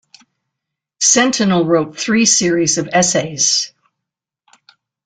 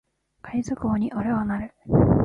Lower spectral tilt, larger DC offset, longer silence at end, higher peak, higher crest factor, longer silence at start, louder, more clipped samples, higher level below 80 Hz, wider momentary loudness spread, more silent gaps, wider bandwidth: second, -2.5 dB/octave vs -9.5 dB/octave; neither; first, 1.4 s vs 0 s; first, 0 dBFS vs -4 dBFS; about the same, 16 dB vs 18 dB; first, 1 s vs 0.45 s; first, -13 LUFS vs -25 LUFS; neither; second, -56 dBFS vs -38 dBFS; second, 5 LU vs 10 LU; neither; about the same, 10.5 kHz vs 9.6 kHz